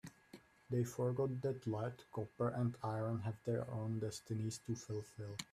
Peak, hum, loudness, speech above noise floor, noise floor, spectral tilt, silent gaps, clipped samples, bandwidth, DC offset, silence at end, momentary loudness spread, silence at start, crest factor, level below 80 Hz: -26 dBFS; none; -42 LUFS; 22 dB; -63 dBFS; -6.5 dB/octave; none; under 0.1%; 14.5 kHz; under 0.1%; 0.1 s; 9 LU; 0.05 s; 16 dB; -74 dBFS